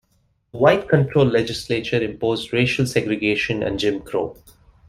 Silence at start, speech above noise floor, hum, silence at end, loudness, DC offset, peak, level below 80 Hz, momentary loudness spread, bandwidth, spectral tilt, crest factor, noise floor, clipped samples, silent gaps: 0.55 s; 45 dB; none; 0.55 s; -20 LUFS; under 0.1%; -2 dBFS; -48 dBFS; 8 LU; 14.5 kHz; -6 dB/octave; 18 dB; -64 dBFS; under 0.1%; none